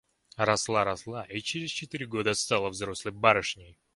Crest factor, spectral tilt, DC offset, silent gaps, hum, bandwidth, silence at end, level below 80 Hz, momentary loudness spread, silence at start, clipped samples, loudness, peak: 26 dB; -3 dB/octave; under 0.1%; none; none; 11.5 kHz; 0.25 s; -60 dBFS; 12 LU; 0.4 s; under 0.1%; -29 LUFS; -4 dBFS